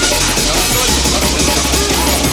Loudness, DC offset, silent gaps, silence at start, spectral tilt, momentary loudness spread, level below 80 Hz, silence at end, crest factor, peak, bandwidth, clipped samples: -12 LUFS; under 0.1%; none; 0 s; -2.5 dB/octave; 1 LU; -22 dBFS; 0 s; 14 dB; 0 dBFS; 19.5 kHz; under 0.1%